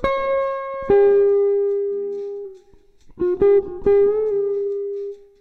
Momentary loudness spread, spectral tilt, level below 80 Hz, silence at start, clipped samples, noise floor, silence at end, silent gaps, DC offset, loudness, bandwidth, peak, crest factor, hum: 14 LU; -8 dB/octave; -46 dBFS; 0 s; under 0.1%; -50 dBFS; 0.25 s; none; under 0.1%; -19 LUFS; 4.6 kHz; -6 dBFS; 12 dB; none